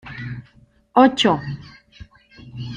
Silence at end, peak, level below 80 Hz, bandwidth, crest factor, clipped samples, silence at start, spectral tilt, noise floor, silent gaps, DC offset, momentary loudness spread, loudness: 0 s; -2 dBFS; -52 dBFS; 9.6 kHz; 20 dB; under 0.1%; 0.05 s; -5.5 dB/octave; -54 dBFS; none; under 0.1%; 22 LU; -17 LUFS